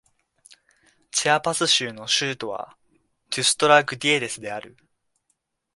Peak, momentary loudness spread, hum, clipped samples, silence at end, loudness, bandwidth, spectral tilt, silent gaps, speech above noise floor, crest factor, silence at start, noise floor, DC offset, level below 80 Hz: -2 dBFS; 16 LU; none; under 0.1%; 1.1 s; -21 LUFS; 12 kHz; -1.5 dB/octave; none; 51 dB; 24 dB; 1.15 s; -74 dBFS; under 0.1%; -68 dBFS